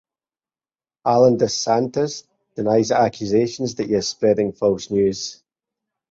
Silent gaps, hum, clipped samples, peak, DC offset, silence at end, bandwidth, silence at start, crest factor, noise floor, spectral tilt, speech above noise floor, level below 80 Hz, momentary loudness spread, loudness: none; none; under 0.1%; -2 dBFS; under 0.1%; 0.75 s; 8 kHz; 1.05 s; 18 dB; under -90 dBFS; -5 dB/octave; over 71 dB; -56 dBFS; 10 LU; -20 LUFS